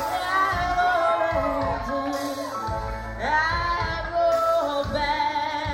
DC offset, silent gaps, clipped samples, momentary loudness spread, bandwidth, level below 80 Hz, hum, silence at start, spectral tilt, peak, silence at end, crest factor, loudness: under 0.1%; none; under 0.1%; 8 LU; 16.5 kHz; -40 dBFS; none; 0 s; -4.5 dB/octave; -10 dBFS; 0 s; 14 dB; -24 LUFS